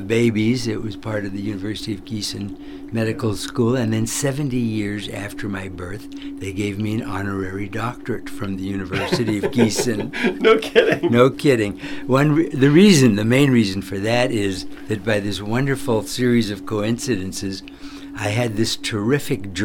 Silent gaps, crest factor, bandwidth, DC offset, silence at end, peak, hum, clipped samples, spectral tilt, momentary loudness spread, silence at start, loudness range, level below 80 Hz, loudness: none; 18 dB; 18 kHz; under 0.1%; 0 s; -2 dBFS; none; under 0.1%; -5.5 dB/octave; 13 LU; 0 s; 10 LU; -46 dBFS; -20 LUFS